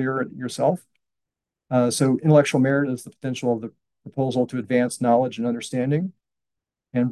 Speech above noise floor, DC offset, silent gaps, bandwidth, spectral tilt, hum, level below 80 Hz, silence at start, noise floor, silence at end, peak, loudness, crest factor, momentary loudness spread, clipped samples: 64 dB; under 0.1%; none; 12.5 kHz; -6 dB/octave; none; -68 dBFS; 0 s; -86 dBFS; 0 s; -4 dBFS; -22 LUFS; 18 dB; 13 LU; under 0.1%